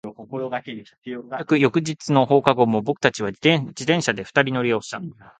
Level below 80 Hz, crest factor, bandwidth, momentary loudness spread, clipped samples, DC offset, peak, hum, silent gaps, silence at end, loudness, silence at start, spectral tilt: -62 dBFS; 22 dB; 9.4 kHz; 15 LU; under 0.1%; under 0.1%; 0 dBFS; none; 0.98-1.02 s; 0.3 s; -21 LUFS; 0.05 s; -5.5 dB/octave